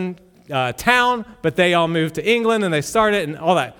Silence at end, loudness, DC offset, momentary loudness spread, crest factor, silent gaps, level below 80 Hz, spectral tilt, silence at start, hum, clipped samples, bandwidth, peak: 0.05 s; -18 LUFS; under 0.1%; 7 LU; 18 dB; none; -50 dBFS; -4.5 dB/octave; 0 s; none; under 0.1%; 19 kHz; 0 dBFS